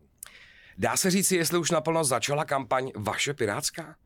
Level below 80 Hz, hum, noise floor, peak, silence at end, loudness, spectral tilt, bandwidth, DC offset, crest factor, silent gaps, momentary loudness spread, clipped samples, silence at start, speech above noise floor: -60 dBFS; none; -52 dBFS; -12 dBFS; 0.15 s; -26 LUFS; -3.5 dB/octave; 19 kHz; under 0.1%; 16 dB; none; 9 LU; under 0.1%; 0.35 s; 25 dB